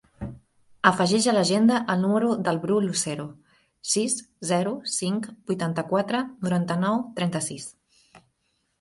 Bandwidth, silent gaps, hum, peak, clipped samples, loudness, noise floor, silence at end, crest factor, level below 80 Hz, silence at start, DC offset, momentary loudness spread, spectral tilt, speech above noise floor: 11.5 kHz; none; none; 0 dBFS; under 0.1%; -24 LUFS; -73 dBFS; 1.1 s; 24 dB; -60 dBFS; 0.2 s; under 0.1%; 14 LU; -4.5 dB/octave; 49 dB